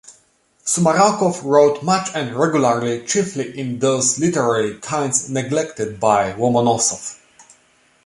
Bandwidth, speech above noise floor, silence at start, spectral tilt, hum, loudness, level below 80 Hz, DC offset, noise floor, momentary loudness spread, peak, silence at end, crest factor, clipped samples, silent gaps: 11.5 kHz; 41 dB; 0.1 s; -4 dB/octave; none; -18 LUFS; -58 dBFS; under 0.1%; -58 dBFS; 9 LU; -2 dBFS; 0.65 s; 18 dB; under 0.1%; none